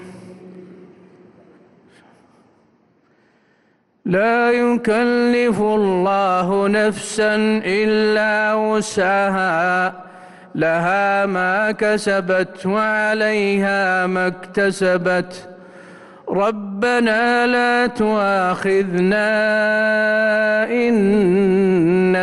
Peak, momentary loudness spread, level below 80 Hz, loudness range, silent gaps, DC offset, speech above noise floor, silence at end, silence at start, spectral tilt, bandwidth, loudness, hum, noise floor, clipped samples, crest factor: -8 dBFS; 5 LU; -54 dBFS; 4 LU; none; under 0.1%; 43 dB; 0 s; 0 s; -5.5 dB/octave; 12 kHz; -17 LUFS; none; -60 dBFS; under 0.1%; 10 dB